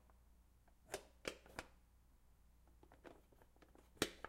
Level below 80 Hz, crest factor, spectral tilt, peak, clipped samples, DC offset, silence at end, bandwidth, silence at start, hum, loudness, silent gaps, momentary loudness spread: -70 dBFS; 34 dB; -2.5 dB/octave; -20 dBFS; under 0.1%; under 0.1%; 0 s; 16 kHz; 0 s; none; -51 LUFS; none; 23 LU